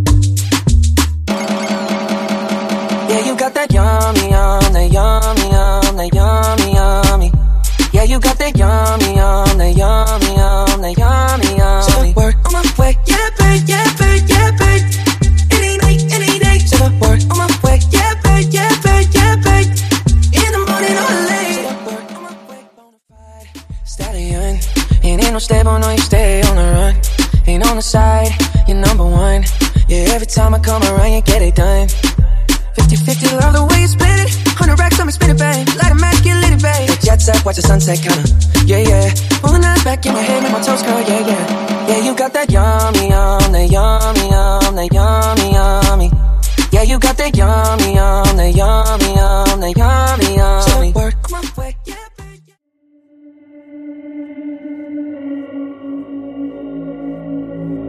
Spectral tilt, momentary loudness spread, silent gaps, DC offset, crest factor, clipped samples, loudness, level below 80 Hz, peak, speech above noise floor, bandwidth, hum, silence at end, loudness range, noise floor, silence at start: -5 dB/octave; 13 LU; none; under 0.1%; 10 dB; under 0.1%; -12 LUFS; -14 dBFS; 0 dBFS; 45 dB; 15.5 kHz; none; 0 s; 9 LU; -55 dBFS; 0 s